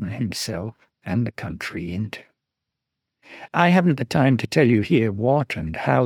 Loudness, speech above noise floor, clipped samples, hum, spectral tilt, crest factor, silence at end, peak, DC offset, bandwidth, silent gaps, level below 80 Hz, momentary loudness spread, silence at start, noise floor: -21 LUFS; 62 dB; under 0.1%; none; -6.5 dB/octave; 20 dB; 0 s; -2 dBFS; under 0.1%; 16.5 kHz; none; -54 dBFS; 14 LU; 0 s; -83 dBFS